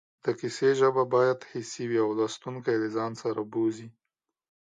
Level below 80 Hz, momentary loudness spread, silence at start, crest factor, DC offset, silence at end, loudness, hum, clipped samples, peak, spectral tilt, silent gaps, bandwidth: -76 dBFS; 10 LU; 0.25 s; 18 dB; under 0.1%; 0.9 s; -28 LUFS; none; under 0.1%; -10 dBFS; -5.5 dB/octave; none; 9.4 kHz